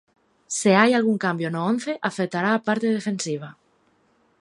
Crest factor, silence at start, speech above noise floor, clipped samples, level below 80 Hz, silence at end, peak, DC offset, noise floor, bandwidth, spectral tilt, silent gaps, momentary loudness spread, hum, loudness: 22 dB; 0.5 s; 41 dB; under 0.1%; -72 dBFS; 0.9 s; -2 dBFS; under 0.1%; -63 dBFS; 11.5 kHz; -5 dB/octave; none; 12 LU; none; -22 LUFS